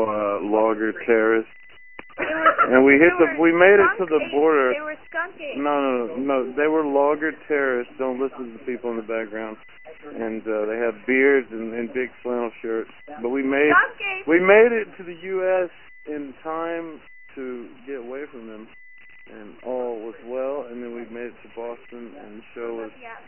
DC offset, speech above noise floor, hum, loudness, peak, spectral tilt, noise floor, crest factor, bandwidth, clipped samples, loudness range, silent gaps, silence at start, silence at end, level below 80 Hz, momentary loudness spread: 0.4%; 27 dB; none; -21 LUFS; 0 dBFS; -8.5 dB/octave; -49 dBFS; 22 dB; 3.2 kHz; under 0.1%; 16 LU; none; 0 s; 0.1 s; -60 dBFS; 21 LU